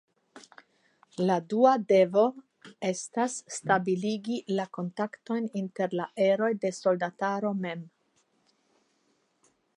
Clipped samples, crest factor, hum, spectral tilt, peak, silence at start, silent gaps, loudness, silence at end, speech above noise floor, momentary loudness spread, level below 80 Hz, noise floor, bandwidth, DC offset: under 0.1%; 22 dB; none; -5.5 dB/octave; -8 dBFS; 0.35 s; none; -28 LUFS; 1.9 s; 44 dB; 11 LU; -78 dBFS; -72 dBFS; 11.5 kHz; under 0.1%